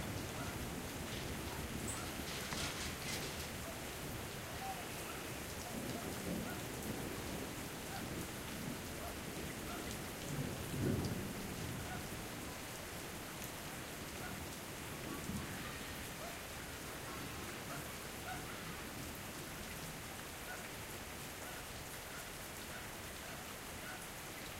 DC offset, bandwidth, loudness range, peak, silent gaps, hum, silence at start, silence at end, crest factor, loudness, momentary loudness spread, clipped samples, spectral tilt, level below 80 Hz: under 0.1%; 16 kHz; 4 LU; -24 dBFS; none; none; 0 s; 0 s; 20 dB; -44 LUFS; 5 LU; under 0.1%; -3.5 dB/octave; -58 dBFS